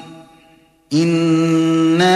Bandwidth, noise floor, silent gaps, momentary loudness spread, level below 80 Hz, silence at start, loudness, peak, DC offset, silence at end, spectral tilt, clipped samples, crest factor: 12 kHz; -51 dBFS; none; 4 LU; -60 dBFS; 0 s; -15 LUFS; -4 dBFS; under 0.1%; 0 s; -6 dB/octave; under 0.1%; 12 dB